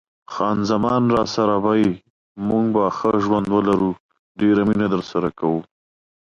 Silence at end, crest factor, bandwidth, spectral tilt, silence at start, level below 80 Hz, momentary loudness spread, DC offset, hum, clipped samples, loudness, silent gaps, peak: 0.65 s; 14 dB; 7.4 kHz; -7 dB/octave; 0.3 s; -52 dBFS; 7 LU; under 0.1%; none; under 0.1%; -20 LUFS; 2.10-2.35 s, 4.00-4.09 s, 4.19-4.35 s; -6 dBFS